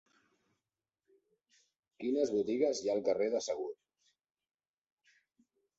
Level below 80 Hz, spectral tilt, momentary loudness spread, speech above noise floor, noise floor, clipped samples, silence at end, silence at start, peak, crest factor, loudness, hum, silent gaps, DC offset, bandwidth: -80 dBFS; -4.5 dB/octave; 10 LU; over 57 dB; under -90 dBFS; under 0.1%; 2.05 s; 2 s; -18 dBFS; 20 dB; -34 LUFS; none; none; under 0.1%; 8 kHz